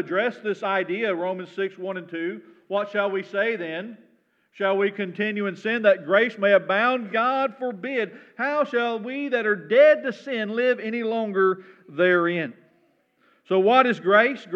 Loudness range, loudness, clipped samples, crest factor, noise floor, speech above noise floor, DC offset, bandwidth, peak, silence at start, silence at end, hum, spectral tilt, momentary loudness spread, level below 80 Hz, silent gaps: 5 LU; -23 LUFS; under 0.1%; 20 dB; -64 dBFS; 41 dB; under 0.1%; 7.4 kHz; -4 dBFS; 0 s; 0 s; none; -6.5 dB/octave; 12 LU; under -90 dBFS; none